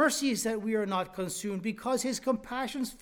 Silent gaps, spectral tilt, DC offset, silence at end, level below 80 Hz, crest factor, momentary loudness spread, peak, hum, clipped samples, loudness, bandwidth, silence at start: none; -3.5 dB/octave; under 0.1%; 0 s; -62 dBFS; 18 dB; 6 LU; -14 dBFS; none; under 0.1%; -31 LUFS; 19 kHz; 0 s